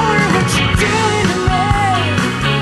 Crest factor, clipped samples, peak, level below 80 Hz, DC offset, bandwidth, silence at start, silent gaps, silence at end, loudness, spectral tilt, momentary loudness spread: 14 dB; under 0.1%; 0 dBFS; -28 dBFS; under 0.1%; 12.5 kHz; 0 s; none; 0 s; -14 LUFS; -4.5 dB/octave; 2 LU